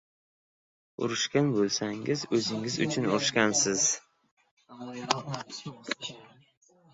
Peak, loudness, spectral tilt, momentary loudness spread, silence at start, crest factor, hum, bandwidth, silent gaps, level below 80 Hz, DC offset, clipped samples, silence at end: -6 dBFS; -28 LUFS; -3 dB/octave; 16 LU; 1 s; 24 dB; none; 8.4 kHz; 4.31-4.37 s, 4.51-4.57 s; -70 dBFS; under 0.1%; under 0.1%; 0.7 s